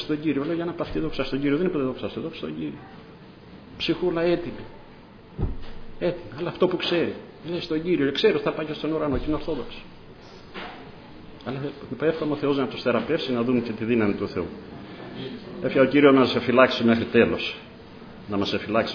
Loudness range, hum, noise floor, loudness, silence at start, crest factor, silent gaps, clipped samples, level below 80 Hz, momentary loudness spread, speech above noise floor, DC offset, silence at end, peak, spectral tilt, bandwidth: 9 LU; none; -46 dBFS; -24 LUFS; 0 s; 22 dB; none; under 0.1%; -44 dBFS; 22 LU; 22 dB; under 0.1%; 0 s; -2 dBFS; -7 dB/octave; 5.4 kHz